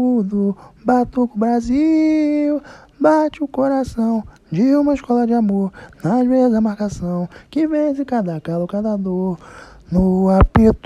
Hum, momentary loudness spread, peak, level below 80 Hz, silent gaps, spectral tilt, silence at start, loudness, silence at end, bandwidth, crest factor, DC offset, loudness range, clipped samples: none; 9 LU; 0 dBFS; -32 dBFS; none; -8.5 dB/octave; 0 s; -18 LUFS; 0.1 s; 10.5 kHz; 16 dB; under 0.1%; 3 LU; under 0.1%